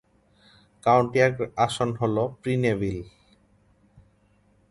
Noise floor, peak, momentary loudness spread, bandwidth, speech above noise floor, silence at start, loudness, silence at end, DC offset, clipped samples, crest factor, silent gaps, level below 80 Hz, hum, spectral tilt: -62 dBFS; -6 dBFS; 8 LU; 11.5 kHz; 39 dB; 0.85 s; -24 LUFS; 1.6 s; under 0.1%; under 0.1%; 22 dB; none; -54 dBFS; none; -6.5 dB/octave